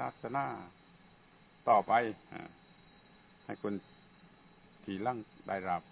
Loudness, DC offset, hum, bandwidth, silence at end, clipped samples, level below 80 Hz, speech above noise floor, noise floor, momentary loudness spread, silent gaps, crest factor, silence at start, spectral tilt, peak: -35 LUFS; under 0.1%; none; 4 kHz; 0.1 s; under 0.1%; -72 dBFS; 28 dB; -62 dBFS; 21 LU; none; 24 dB; 0 s; -4.5 dB/octave; -14 dBFS